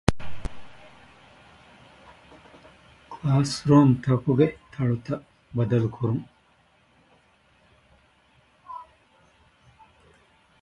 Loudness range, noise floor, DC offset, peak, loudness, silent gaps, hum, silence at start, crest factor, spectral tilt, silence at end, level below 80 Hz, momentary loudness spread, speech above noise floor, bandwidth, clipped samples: 13 LU; -62 dBFS; under 0.1%; 0 dBFS; -24 LUFS; none; none; 0.1 s; 26 dB; -7.5 dB/octave; 1.8 s; -48 dBFS; 24 LU; 40 dB; 11.5 kHz; under 0.1%